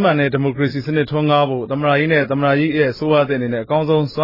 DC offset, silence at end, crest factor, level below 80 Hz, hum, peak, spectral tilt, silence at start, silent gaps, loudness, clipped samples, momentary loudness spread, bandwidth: under 0.1%; 0 s; 14 dB; -52 dBFS; none; -4 dBFS; -9 dB/octave; 0 s; none; -17 LUFS; under 0.1%; 4 LU; 5.8 kHz